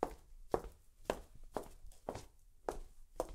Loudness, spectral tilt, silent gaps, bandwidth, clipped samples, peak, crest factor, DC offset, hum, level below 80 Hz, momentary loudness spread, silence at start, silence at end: -46 LUFS; -5 dB/octave; none; 16 kHz; under 0.1%; -16 dBFS; 30 dB; under 0.1%; none; -56 dBFS; 16 LU; 0 s; 0 s